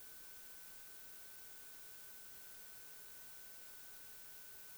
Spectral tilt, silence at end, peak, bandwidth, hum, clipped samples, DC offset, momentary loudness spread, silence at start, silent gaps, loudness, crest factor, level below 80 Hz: 0 dB/octave; 0 s; -42 dBFS; over 20 kHz; none; under 0.1%; under 0.1%; 0 LU; 0 s; none; -52 LUFS; 14 dB; -80 dBFS